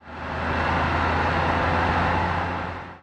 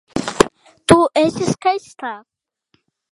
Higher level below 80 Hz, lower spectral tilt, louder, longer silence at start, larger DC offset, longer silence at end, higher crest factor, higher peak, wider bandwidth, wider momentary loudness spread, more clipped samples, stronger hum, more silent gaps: first, -36 dBFS vs -46 dBFS; first, -6.5 dB/octave vs -4.5 dB/octave; second, -23 LUFS vs -17 LUFS; about the same, 0.05 s vs 0.15 s; neither; second, 0.05 s vs 0.95 s; about the same, 16 dB vs 18 dB; second, -8 dBFS vs 0 dBFS; second, 8.8 kHz vs 16 kHz; second, 8 LU vs 16 LU; neither; neither; neither